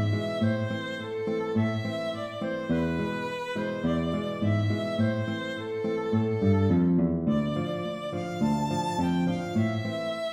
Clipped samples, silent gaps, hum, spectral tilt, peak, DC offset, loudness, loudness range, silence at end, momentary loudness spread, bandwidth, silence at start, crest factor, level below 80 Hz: under 0.1%; none; none; -7.5 dB/octave; -12 dBFS; under 0.1%; -28 LUFS; 3 LU; 0 s; 8 LU; 11 kHz; 0 s; 14 dB; -54 dBFS